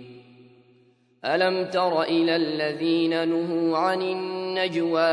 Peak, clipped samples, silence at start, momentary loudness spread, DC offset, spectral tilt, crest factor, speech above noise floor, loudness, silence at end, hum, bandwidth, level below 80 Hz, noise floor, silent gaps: -8 dBFS; under 0.1%; 0 s; 5 LU; under 0.1%; -6 dB/octave; 18 dB; 37 dB; -24 LUFS; 0 s; none; 10.5 kHz; -78 dBFS; -60 dBFS; none